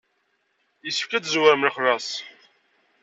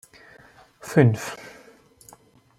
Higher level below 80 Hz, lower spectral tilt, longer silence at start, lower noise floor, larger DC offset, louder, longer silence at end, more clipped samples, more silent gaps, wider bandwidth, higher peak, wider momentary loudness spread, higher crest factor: second, -80 dBFS vs -64 dBFS; second, -2.5 dB/octave vs -7 dB/octave; about the same, 0.85 s vs 0.85 s; first, -70 dBFS vs -53 dBFS; neither; about the same, -22 LUFS vs -22 LUFS; second, 0.7 s vs 1.1 s; neither; neither; second, 8 kHz vs 15 kHz; about the same, -4 dBFS vs -4 dBFS; second, 16 LU vs 24 LU; about the same, 22 dB vs 24 dB